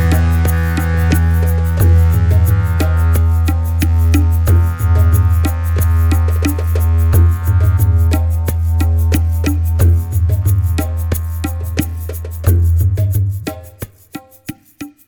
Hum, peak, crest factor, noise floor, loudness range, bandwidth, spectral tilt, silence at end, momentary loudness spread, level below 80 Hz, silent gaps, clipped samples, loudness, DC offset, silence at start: none; 0 dBFS; 12 dB; -34 dBFS; 4 LU; 20 kHz; -7 dB/octave; 0.2 s; 12 LU; -18 dBFS; none; under 0.1%; -14 LUFS; under 0.1%; 0 s